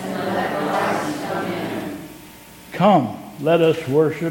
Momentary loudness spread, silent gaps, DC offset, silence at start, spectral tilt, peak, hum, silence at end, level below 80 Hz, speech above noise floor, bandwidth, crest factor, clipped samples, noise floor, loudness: 19 LU; none; under 0.1%; 0 s; -6 dB/octave; -2 dBFS; none; 0 s; -56 dBFS; 25 dB; 17.5 kHz; 18 dB; under 0.1%; -42 dBFS; -20 LUFS